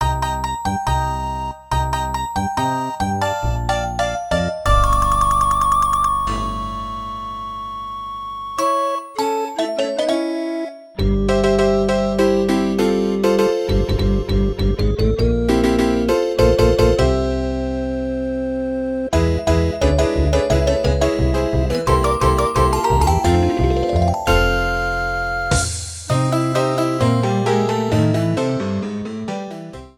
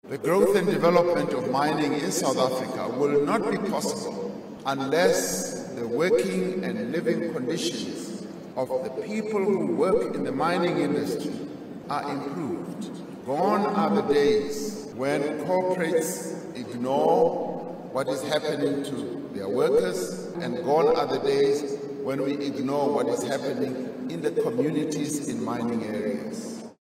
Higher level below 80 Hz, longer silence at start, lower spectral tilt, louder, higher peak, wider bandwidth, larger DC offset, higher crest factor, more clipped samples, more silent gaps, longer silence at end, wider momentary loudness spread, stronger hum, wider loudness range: first, -26 dBFS vs -62 dBFS; about the same, 0 s vs 0.05 s; about the same, -6 dB/octave vs -5 dB/octave; first, -19 LUFS vs -26 LUFS; first, 0 dBFS vs -6 dBFS; about the same, 17.5 kHz vs 16 kHz; neither; about the same, 18 dB vs 20 dB; neither; neither; about the same, 0.1 s vs 0.1 s; about the same, 10 LU vs 11 LU; neither; about the same, 5 LU vs 3 LU